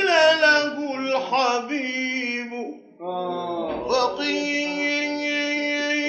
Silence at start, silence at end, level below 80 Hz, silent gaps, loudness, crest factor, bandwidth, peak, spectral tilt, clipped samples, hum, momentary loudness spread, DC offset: 0 s; 0 s; -62 dBFS; none; -22 LUFS; 18 dB; 8.4 kHz; -6 dBFS; -2.5 dB/octave; under 0.1%; none; 12 LU; under 0.1%